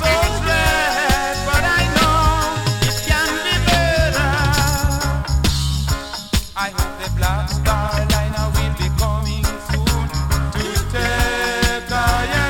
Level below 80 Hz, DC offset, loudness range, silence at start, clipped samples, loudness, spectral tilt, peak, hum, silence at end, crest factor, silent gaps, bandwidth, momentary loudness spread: -22 dBFS; under 0.1%; 4 LU; 0 s; under 0.1%; -18 LUFS; -4 dB/octave; -2 dBFS; none; 0 s; 16 dB; none; 17.5 kHz; 6 LU